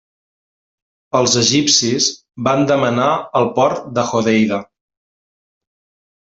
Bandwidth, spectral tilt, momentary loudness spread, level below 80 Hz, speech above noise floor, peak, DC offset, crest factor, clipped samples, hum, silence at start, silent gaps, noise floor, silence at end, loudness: 8.4 kHz; -3.5 dB/octave; 7 LU; -58 dBFS; over 75 dB; 0 dBFS; under 0.1%; 18 dB; under 0.1%; none; 1.15 s; none; under -90 dBFS; 1.7 s; -15 LUFS